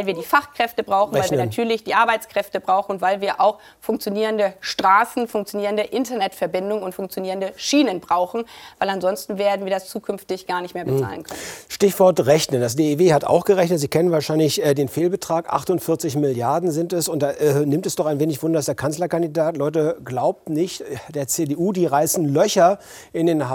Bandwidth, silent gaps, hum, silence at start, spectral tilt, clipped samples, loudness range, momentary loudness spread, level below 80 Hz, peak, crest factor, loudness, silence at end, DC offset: 19.5 kHz; none; none; 0 s; -5 dB/octave; under 0.1%; 5 LU; 9 LU; -60 dBFS; -4 dBFS; 16 dB; -20 LUFS; 0 s; under 0.1%